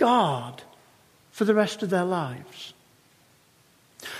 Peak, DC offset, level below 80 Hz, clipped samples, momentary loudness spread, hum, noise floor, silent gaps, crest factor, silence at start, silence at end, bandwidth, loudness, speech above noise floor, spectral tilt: -8 dBFS; under 0.1%; -74 dBFS; under 0.1%; 20 LU; none; -60 dBFS; none; 20 dB; 0 s; 0 s; 15.5 kHz; -25 LUFS; 36 dB; -5.5 dB/octave